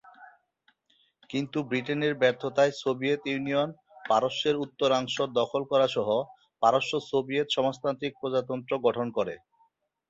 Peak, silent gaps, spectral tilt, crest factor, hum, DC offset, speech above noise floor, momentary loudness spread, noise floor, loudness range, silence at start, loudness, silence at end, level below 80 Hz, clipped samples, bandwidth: -8 dBFS; none; -5 dB/octave; 20 dB; none; under 0.1%; 43 dB; 7 LU; -70 dBFS; 2 LU; 0.2 s; -28 LUFS; 0.75 s; -72 dBFS; under 0.1%; 8 kHz